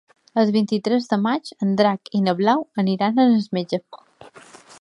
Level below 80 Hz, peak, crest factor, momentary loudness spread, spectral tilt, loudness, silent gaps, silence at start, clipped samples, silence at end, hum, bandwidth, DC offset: -68 dBFS; -4 dBFS; 18 dB; 7 LU; -7 dB/octave; -20 LUFS; none; 0.35 s; under 0.1%; 0.85 s; none; 11 kHz; under 0.1%